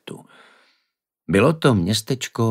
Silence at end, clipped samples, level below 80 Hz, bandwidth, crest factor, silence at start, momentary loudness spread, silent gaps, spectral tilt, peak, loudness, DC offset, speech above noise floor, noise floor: 0 s; under 0.1%; -52 dBFS; 16 kHz; 20 dB; 0.05 s; 19 LU; none; -5.5 dB/octave; -2 dBFS; -19 LUFS; under 0.1%; 57 dB; -75 dBFS